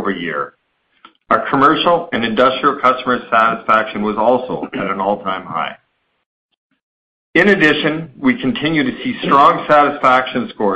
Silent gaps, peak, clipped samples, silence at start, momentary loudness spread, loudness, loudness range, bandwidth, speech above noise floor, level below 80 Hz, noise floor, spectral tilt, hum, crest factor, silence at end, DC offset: 6.26-6.49 s, 6.57-6.70 s, 6.82-7.33 s; 0 dBFS; under 0.1%; 0 s; 11 LU; -15 LUFS; 6 LU; 8.6 kHz; 34 dB; -52 dBFS; -49 dBFS; -6.5 dB/octave; none; 16 dB; 0 s; under 0.1%